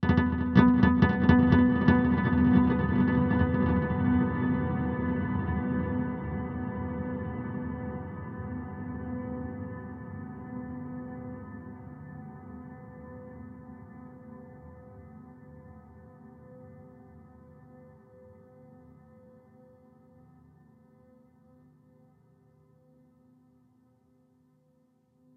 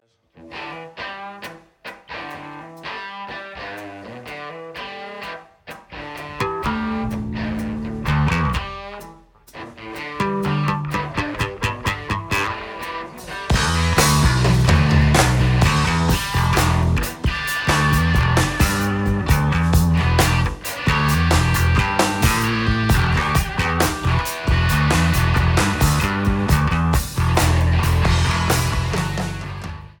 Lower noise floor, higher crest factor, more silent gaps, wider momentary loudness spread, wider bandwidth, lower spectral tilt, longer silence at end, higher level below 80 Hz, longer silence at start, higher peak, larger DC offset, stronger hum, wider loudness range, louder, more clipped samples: first, -67 dBFS vs -47 dBFS; first, 24 dB vs 18 dB; neither; first, 26 LU vs 17 LU; second, 5.6 kHz vs 19 kHz; first, -10 dB/octave vs -5 dB/octave; first, 8.15 s vs 0.15 s; second, -44 dBFS vs -26 dBFS; second, 0 s vs 0.4 s; second, -6 dBFS vs -2 dBFS; neither; neither; first, 26 LU vs 15 LU; second, -27 LUFS vs -19 LUFS; neither